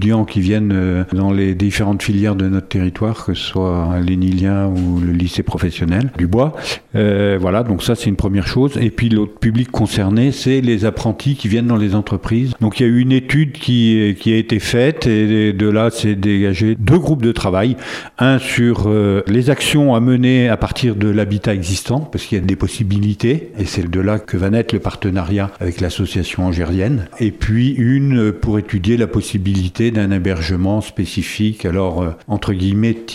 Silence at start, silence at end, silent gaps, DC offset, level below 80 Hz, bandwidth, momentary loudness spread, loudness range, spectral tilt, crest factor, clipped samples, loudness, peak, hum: 0 s; 0 s; none; under 0.1%; -34 dBFS; 14.5 kHz; 6 LU; 4 LU; -6.5 dB/octave; 14 dB; under 0.1%; -16 LUFS; 0 dBFS; none